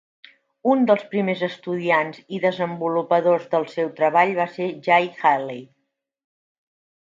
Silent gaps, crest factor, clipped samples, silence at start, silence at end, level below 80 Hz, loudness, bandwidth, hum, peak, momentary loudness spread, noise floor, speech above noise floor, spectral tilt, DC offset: none; 18 dB; under 0.1%; 0.65 s; 1.45 s; -76 dBFS; -21 LUFS; 7.6 kHz; none; -4 dBFS; 8 LU; -76 dBFS; 55 dB; -7 dB/octave; under 0.1%